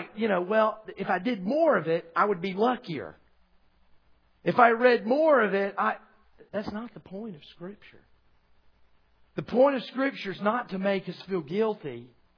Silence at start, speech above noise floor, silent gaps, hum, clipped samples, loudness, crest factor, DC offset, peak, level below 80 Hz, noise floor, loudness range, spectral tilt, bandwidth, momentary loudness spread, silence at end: 0 s; 36 dB; none; none; under 0.1%; -26 LUFS; 22 dB; under 0.1%; -6 dBFS; -68 dBFS; -62 dBFS; 11 LU; -8 dB/octave; 5.4 kHz; 19 LU; 0.3 s